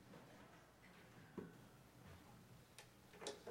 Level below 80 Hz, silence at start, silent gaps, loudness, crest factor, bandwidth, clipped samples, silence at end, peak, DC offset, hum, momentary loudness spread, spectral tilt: -78 dBFS; 0 s; none; -60 LUFS; 26 dB; 16 kHz; under 0.1%; 0 s; -34 dBFS; under 0.1%; none; 11 LU; -4 dB/octave